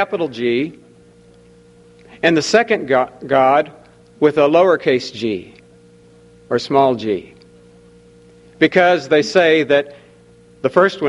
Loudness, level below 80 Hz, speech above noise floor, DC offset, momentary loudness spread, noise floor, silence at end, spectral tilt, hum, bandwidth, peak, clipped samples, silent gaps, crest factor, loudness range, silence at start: -16 LUFS; -58 dBFS; 32 dB; under 0.1%; 10 LU; -47 dBFS; 0 s; -5 dB/octave; none; 11.5 kHz; 0 dBFS; under 0.1%; none; 18 dB; 5 LU; 0 s